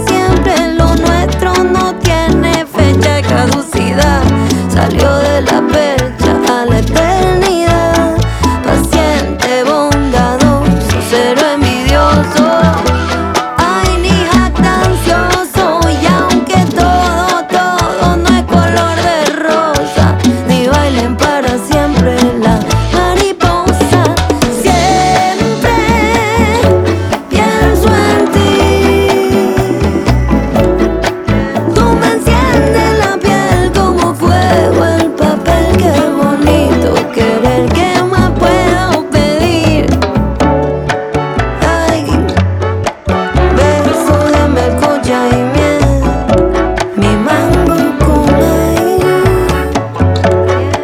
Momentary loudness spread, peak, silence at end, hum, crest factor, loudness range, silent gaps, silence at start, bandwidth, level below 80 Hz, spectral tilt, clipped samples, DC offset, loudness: 3 LU; 0 dBFS; 0 s; none; 10 dB; 1 LU; none; 0 s; 18 kHz; -20 dBFS; -5.5 dB/octave; under 0.1%; under 0.1%; -10 LUFS